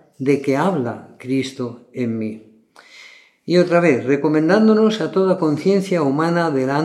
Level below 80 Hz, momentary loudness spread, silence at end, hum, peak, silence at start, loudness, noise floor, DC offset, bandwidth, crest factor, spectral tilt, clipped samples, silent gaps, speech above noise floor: -72 dBFS; 13 LU; 0 s; none; -2 dBFS; 0.2 s; -18 LUFS; -46 dBFS; under 0.1%; 12.5 kHz; 16 dB; -7 dB/octave; under 0.1%; none; 29 dB